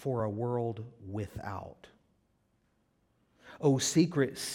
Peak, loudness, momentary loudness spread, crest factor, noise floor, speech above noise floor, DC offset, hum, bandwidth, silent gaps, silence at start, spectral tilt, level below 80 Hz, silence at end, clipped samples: -14 dBFS; -32 LUFS; 16 LU; 20 dB; -73 dBFS; 42 dB; under 0.1%; none; 16.5 kHz; none; 0 s; -5 dB/octave; -64 dBFS; 0 s; under 0.1%